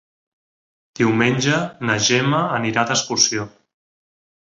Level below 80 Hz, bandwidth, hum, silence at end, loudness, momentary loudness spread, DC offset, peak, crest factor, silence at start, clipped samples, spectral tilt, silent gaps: -58 dBFS; 8 kHz; none; 0.95 s; -18 LUFS; 5 LU; under 0.1%; -2 dBFS; 18 dB; 1 s; under 0.1%; -3.5 dB/octave; none